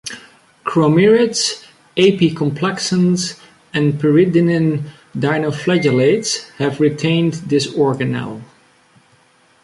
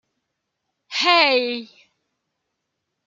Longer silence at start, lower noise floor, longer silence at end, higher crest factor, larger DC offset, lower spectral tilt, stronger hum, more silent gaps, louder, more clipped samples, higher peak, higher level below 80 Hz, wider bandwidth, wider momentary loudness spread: second, 0.05 s vs 0.9 s; second, -53 dBFS vs -78 dBFS; second, 1.2 s vs 1.4 s; second, 14 dB vs 22 dB; neither; first, -5.5 dB/octave vs -1 dB/octave; neither; neither; about the same, -16 LUFS vs -18 LUFS; neither; about the same, -2 dBFS vs -2 dBFS; first, -56 dBFS vs -82 dBFS; first, 11.5 kHz vs 7.8 kHz; about the same, 12 LU vs 14 LU